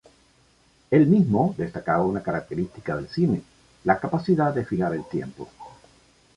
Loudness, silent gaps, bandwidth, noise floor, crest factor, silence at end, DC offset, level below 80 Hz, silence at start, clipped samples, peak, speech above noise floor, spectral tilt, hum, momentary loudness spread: -24 LUFS; none; 10 kHz; -60 dBFS; 20 dB; 0.65 s; under 0.1%; -54 dBFS; 0.9 s; under 0.1%; -6 dBFS; 37 dB; -9 dB/octave; none; 13 LU